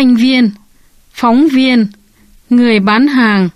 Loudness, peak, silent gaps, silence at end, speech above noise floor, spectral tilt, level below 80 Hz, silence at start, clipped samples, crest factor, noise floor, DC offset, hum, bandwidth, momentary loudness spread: -10 LUFS; 0 dBFS; none; 0.05 s; 37 dB; -6.5 dB/octave; -48 dBFS; 0 s; under 0.1%; 10 dB; -45 dBFS; under 0.1%; none; 11 kHz; 6 LU